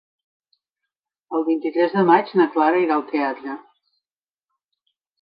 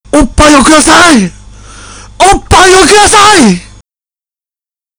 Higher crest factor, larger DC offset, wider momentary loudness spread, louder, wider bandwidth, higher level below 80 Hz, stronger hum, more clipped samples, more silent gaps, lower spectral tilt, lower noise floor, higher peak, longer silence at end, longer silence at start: first, 20 dB vs 6 dB; neither; first, 13 LU vs 7 LU; second, -19 LUFS vs -3 LUFS; second, 5.2 kHz vs over 20 kHz; second, -78 dBFS vs -22 dBFS; neither; second, under 0.1% vs 5%; neither; first, -9.5 dB/octave vs -3 dB/octave; about the same, under -90 dBFS vs under -90 dBFS; about the same, -2 dBFS vs 0 dBFS; first, 1.65 s vs 1.35 s; first, 1.3 s vs 0.15 s